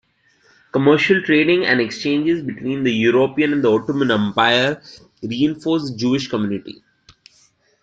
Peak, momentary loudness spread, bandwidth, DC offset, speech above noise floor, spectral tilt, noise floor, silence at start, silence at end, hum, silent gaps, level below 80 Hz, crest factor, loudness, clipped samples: -2 dBFS; 10 LU; 7.8 kHz; under 0.1%; 40 dB; -6 dB/octave; -58 dBFS; 0.75 s; 1.1 s; none; none; -58 dBFS; 16 dB; -17 LUFS; under 0.1%